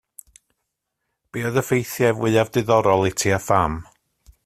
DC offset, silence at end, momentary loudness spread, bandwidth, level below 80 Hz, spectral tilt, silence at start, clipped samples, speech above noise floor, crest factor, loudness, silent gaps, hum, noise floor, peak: under 0.1%; 0.6 s; 8 LU; 16 kHz; -48 dBFS; -5 dB/octave; 1.35 s; under 0.1%; 59 dB; 20 dB; -20 LUFS; none; none; -78 dBFS; -2 dBFS